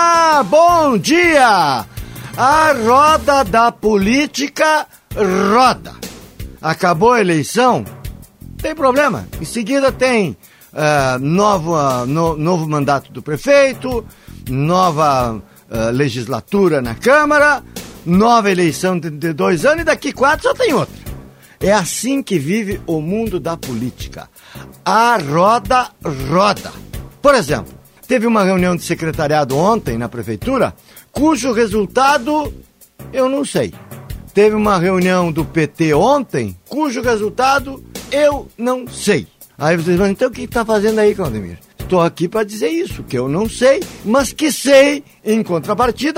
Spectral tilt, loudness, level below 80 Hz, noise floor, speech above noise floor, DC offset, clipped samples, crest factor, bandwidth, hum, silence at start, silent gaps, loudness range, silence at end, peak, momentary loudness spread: -5 dB/octave; -15 LUFS; -38 dBFS; -38 dBFS; 23 dB; under 0.1%; under 0.1%; 14 dB; 16.5 kHz; none; 0 s; none; 4 LU; 0 s; 0 dBFS; 13 LU